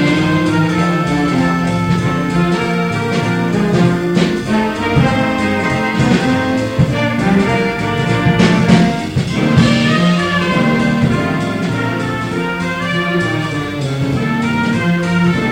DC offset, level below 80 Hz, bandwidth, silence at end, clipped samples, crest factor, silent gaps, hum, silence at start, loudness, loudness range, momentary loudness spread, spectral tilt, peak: under 0.1%; -36 dBFS; 15.5 kHz; 0 s; under 0.1%; 14 dB; none; none; 0 s; -14 LUFS; 4 LU; 6 LU; -6.5 dB/octave; 0 dBFS